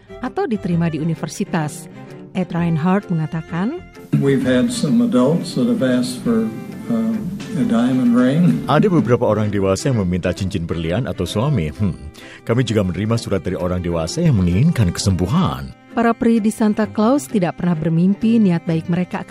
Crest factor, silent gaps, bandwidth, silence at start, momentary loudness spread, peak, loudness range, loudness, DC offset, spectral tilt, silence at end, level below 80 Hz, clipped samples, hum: 14 dB; none; 15 kHz; 0.1 s; 9 LU; -4 dBFS; 4 LU; -18 LUFS; under 0.1%; -7 dB/octave; 0.1 s; -42 dBFS; under 0.1%; none